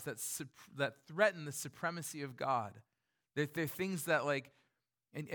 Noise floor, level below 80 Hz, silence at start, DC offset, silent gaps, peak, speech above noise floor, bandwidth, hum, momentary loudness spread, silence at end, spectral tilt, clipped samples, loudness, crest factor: -84 dBFS; -82 dBFS; 0 s; under 0.1%; none; -16 dBFS; 45 dB; 19 kHz; none; 12 LU; 0 s; -4 dB/octave; under 0.1%; -38 LUFS; 24 dB